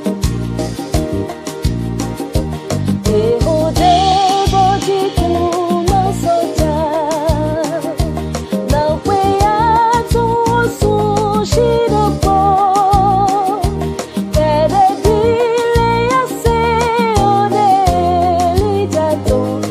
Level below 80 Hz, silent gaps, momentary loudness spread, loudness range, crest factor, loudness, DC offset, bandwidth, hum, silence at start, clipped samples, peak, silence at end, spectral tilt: -26 dBFS; none; 8 LU; 3 LU; 14 dB; -14 LUFS; under 0.1%; 15.5 kHz; none; 0 s; under 0.1%; 0 dBFS; 0 s; -6 dB/octave